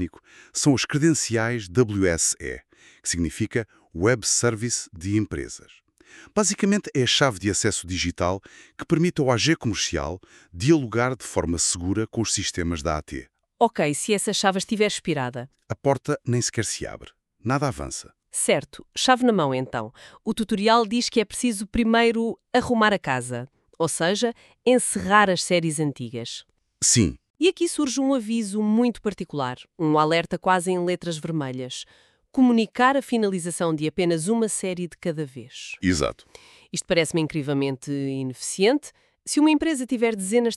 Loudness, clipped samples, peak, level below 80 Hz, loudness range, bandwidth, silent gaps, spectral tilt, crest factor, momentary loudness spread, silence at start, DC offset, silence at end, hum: -23 LUFS; under 0.1%; -4 dBFS; -48 dBFS; 4 LU; 13.5 kHz; 27.30-27.34 s; -4 dB/octave; 20 dB; 13 LU; 0 s; under 0.1%; 0 s; none